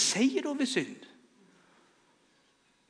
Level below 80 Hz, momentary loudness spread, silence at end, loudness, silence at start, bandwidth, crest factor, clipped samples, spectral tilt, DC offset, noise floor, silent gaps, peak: -88 dBFS; 16 LU; 1.85 s; -30 LUFS; 0 s; 10.5 kHz; 18 dB; under 0.1%; -2.5 dB/octave; under 0.1%; -69 dBFS; none; -16 dBFS